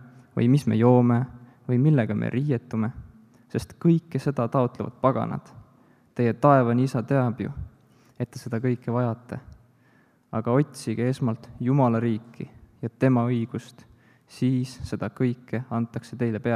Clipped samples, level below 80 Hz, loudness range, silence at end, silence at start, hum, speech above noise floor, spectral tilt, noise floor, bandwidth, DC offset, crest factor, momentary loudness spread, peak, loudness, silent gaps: under 0.1%; -56 dBFS; 5 LU; 0 s; 0 s; none; 37 dB; -8.5 dB/octave; -60 dBFS; 12 kHz; under 0.1%; 20 dB; 16 LU; -4 dBFS; -25 LUFS; none